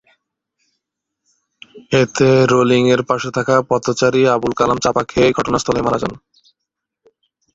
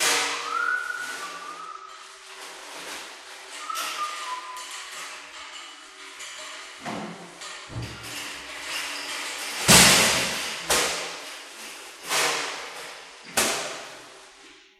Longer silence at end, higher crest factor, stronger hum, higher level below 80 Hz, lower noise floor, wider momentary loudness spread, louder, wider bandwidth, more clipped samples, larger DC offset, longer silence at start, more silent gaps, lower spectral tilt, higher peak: first, 1.4 s vs 0.2 s; second, 16 dB vs 28 dB; neither; first, -46 dBFS vs -52 dBFS; first, -79 dBFS vs -51 dBFS; second, 6 LU vs 18 LU; first, -15 LUFS vs -24 LUFS; second, 8 kHz vs 16 kHz; neither; neither; first, 1.75 s vs 0 s; neither; first, -5.5 dB/octave vs -1 dB/octave; about the same, 0 dBFS vs 0 dBFS